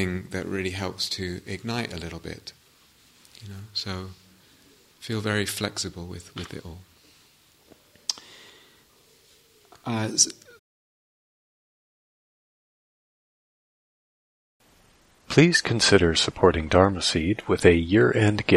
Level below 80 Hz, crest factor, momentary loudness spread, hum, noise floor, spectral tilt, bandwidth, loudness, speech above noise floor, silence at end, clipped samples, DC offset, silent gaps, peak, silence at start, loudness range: -48 dBFS; 26 dB; 20 LU; none; -59 dBFS; -4 dB/octave; 15.5 kHz; -23 LUFS; 35 dB; 0 s; under 0.1%; under 0.1%; 10.59-14.60 s; -2 dBFS; 0 s; 17 LU